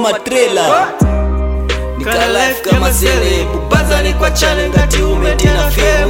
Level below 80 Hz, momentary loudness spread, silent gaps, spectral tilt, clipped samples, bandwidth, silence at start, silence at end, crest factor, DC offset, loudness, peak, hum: -16 dBFS; 5 LU; none; -4.5 dB/octave; under 0.1%; 17.5 kHz; 0 s; 0 s; 12 dB; under 0.1%; -12 LUFS; 0 dBFS; none